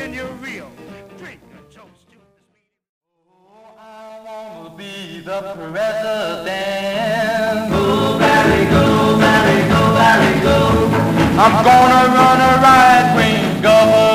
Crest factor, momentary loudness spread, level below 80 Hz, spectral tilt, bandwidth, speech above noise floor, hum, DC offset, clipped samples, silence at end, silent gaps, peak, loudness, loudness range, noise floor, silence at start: 14 dB; 21 LU; -36 dBFS; -5.5 dB/octave; 16 kHz; 52 dB; none; under 0.1%; under 0.1%; 0 s; 2.89-3.01 s; 0 dBFS; -12 LUFS; 16 LU; -66 dBFS; 0 s